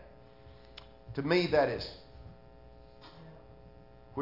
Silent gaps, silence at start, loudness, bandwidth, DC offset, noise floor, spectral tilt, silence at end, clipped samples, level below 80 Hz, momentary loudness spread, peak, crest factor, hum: none; 0 s; -31 LUFS; 5.8 kHz; under 0.1%; -55 dBFS; -7 dB/octave; 0 s; under 0.1%; -58 dBFS; 28 LU; -14 dBFS; 22 dB; none